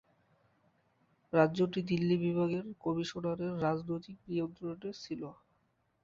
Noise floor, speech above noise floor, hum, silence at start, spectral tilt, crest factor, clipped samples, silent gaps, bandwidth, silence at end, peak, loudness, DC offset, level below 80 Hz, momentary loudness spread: -76 dBFS; 42 dB; none; 1.35 s; -7.5 dB/octave; 24 dB; under 0.1%; none; 7.4 kHz; 0.7 s; -12 dBFS; -34 LUFS; under 0.1%; -70 dBFS; 12 LU